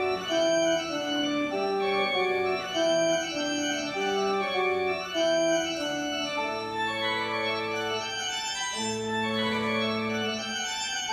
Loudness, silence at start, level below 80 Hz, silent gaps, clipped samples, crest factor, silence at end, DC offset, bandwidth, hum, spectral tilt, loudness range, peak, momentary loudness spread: -27 LUFS; 0 s; -62 dBFS; none; under 0.1%; 12 dB; 0 s; under 0.1%; 15.5 kHz; none; -2.5 dB/octave; 2 LU; -16 dBFS; 5 LU